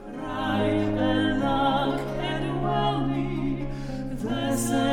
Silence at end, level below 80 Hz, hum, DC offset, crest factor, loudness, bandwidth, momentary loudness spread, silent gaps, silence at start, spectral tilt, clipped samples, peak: 0 s; -38 dBFS; none; under 0.1%; 14 dB; -26 LUFS; 18 kHz; 8 LU; none; 0 s; -5.5 dB/octave; under 0.1%; -12 dBFS